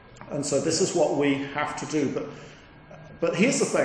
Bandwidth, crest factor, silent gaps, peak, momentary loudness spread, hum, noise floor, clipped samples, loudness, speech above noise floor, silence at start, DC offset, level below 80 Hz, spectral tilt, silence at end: 10.5 kHz; 18 dB; none; -8 dBFS; 13 LU; none; -47 dBFS; under 0.1%; -25 LUFS; 22 dB; 0.05 s; under 0.1%; -58 dBFS; -4 dB/octave; 0 s